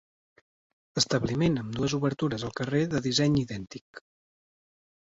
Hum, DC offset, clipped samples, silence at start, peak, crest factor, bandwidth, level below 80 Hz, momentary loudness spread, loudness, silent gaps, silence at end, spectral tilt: none; under 0.1%; under 0.1%; 0.95 s; -10 dBFS; 20 dB; 8 kHz; -56 dBFS; 12 LU; -28 LUFS; 3.81-3.94 s; 1.05 s; -5 dB/octave